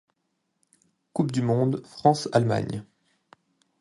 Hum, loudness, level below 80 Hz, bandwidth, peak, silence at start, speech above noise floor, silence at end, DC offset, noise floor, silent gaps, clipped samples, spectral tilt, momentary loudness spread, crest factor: none; -25 LUFS; -62 dBFS; 11.5 kHz; -6 dBFS; 1.15 s; 53 dB; 1 s; under 0.1%; -76 dBFS; none; under 0.1%; -7 dB/octave; 11 LU; 22 dB